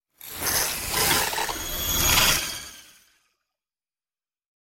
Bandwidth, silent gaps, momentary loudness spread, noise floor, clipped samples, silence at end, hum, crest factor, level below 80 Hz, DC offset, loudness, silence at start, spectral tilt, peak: 17 kHz; none; 15 LU; under -90 dBFS; under 0.1%; 1.95 s; none; 22 dB; -42 dBFS; under 0.1%; -22 LUFS; 0.2 s; -1 dB/octave; -6 dBFS